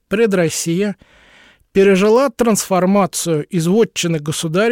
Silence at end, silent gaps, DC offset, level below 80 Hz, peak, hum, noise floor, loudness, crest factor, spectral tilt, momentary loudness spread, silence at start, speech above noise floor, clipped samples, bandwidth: 0 s; none; under 0.1%; -52 dBFS; -2 dBFS; none; -49 dBFS; -15 LUFS; 12 dB; -5 dB/octave; 8 LU; 0.1 s; 34 dB; under 0.1%; 17 kHz